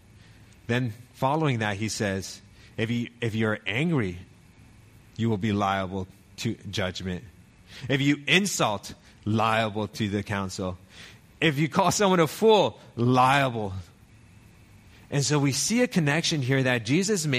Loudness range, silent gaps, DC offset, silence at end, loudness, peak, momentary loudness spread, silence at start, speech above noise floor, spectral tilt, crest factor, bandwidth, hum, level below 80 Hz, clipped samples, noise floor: 6 LU; none; under 0.1%; 0 s; -25 LUFS; -6 dBFS; 15 LU; 0.7 s; 28 dB; -4.5 dB/octave; 20 dB; 15.5 kHz; none; -58 dBFS; under 0.1%; -53 dBFS